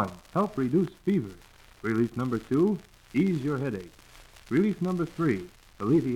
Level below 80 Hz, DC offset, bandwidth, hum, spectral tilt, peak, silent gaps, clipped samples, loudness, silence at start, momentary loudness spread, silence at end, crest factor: -56 dBFS; under 0.1%; 15.5 kHz; none; -8.5 dB/octave; -14 dBFS; none; under 0.1%; -28 LUFS; 0 s; 10 LU; 0 s; 14 dB